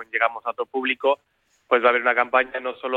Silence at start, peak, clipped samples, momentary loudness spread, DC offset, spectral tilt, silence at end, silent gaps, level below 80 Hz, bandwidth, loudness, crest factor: 0 s; -4 dBFS; under 0.1%; 10 LU; under 0.1%; -4.5 dB/octave; 0 s; none; -68 dBFS; 4.6 kHz; -22 LUFS; 18 dB